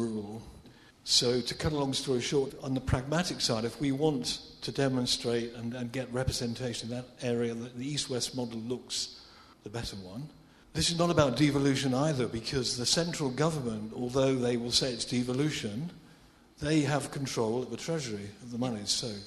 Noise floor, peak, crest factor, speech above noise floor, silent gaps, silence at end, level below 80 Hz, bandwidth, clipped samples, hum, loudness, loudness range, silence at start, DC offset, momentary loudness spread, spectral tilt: -58 dBFS; -10 dBFS; 22 dB; 27 dB; none; 0 s; -54 dBFS; 13.5 kHz; under 0.1%; none; -31 LUFS; 6 LU; 0 s; under 0.1%; 13 LU; -4.5 dB/octave